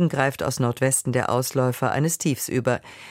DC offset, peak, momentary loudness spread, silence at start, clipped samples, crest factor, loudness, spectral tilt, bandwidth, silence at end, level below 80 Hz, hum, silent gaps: under 0.1%; -6 dBFS; 3 LU; 0 s; under 0.1%; 18 dB; -23 LUFS; -5 dB/octave; 16.5 kHz; 0 s; -56 dBFS; none; none